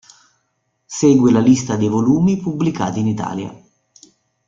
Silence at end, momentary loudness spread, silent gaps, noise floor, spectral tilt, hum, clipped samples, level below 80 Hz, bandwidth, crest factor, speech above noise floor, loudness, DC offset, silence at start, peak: 0.95 s; 14 LU; none; -69 dBFS; -6.5 dB/octave; none; under 0.1%; -52 dBFS; 7.8 kHz; 16 dB; 54 dB; -16 LUFS; under 0.1%; 0.9 s; -2 dBFS